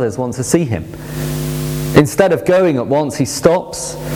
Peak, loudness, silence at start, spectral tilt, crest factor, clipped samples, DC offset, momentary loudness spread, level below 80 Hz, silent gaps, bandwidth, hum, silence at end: 0 dBFS; -15 LUFS; 0 s; -5.5 dB/octave; 16 dB; 0.2%; under 0.1%; 11 LU; -38 dBFS; none; over 20 kHz; none; 0 s